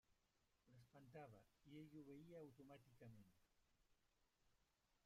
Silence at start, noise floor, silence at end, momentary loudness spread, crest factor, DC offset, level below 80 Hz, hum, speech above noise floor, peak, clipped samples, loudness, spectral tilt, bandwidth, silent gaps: 0.1 s; -86 dBFS; 0.05 s; 5 LU; 18 dB; under 0.1%; -86 dBFS; none; 22 dB; -50 dBFS; under 0.1%; -64 LUFS; -7 dB/octave; 14 kHz; none